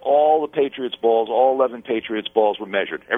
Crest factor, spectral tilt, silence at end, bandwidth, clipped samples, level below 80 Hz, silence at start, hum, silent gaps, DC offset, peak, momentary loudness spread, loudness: 16 dB; -7 dB/octave; 0 s; 3.9 kHz; under 0.1%; -66 dBFS; 0.05 s; none; none; under 0.1%; -4 dBFS; 7 LU; -20 LUFS